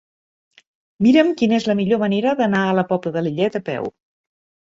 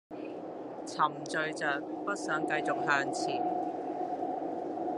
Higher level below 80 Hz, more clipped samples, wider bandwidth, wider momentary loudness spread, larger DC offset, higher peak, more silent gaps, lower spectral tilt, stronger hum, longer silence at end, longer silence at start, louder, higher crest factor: first, -60 dBFS vs -80 dBFS; neither; second, 7.8 kHz vs 11.5 kHz; about the same, 10 LU vs 12 LU; neither; first, -2 dBFS vs -12 dBFS; neither; first, -7 dB/octave vs -4 dB/octave; neither; first, 0.8 s vs 0 s; first, 1 s vs 0.1 s; first, -18 LUFS vs -33 LUFS; about the same, 18 dB vs 20 dB